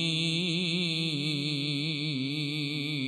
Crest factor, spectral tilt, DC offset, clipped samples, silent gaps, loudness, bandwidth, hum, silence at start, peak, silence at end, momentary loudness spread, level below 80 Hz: 14 dB; -4.5 dB/octave; under 0.1%; under 0.1%; none; -29 LUFS; 12 kHz; none; 0 s; -16 dBFS; 0 s; 3 LU; -76 dBFS